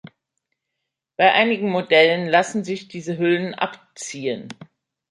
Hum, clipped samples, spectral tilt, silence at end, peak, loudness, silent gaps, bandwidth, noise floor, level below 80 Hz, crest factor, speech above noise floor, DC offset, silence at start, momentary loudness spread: none; under 0.1%; -4.5 dB/octave; 0.45 s; -2 dBFS; -19 LUFS; none; 11.5 kHz; -81 dBFS; -72 dBFS; 20 dB; 61 dB; under 0.1%; 1.2 s; 17 LU